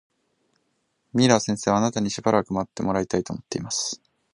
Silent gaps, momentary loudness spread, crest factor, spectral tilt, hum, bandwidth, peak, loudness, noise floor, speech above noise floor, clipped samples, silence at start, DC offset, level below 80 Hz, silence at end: none; 11 LU; 24 dB; -4.5 dB/octave; none; 11.5 kHz; -2 dBFS; -24 LUFS; -72 dBFS; 49 dB; under 0.1%; 1.15 s; under 0.1%; -56 dBFS; 0.35 s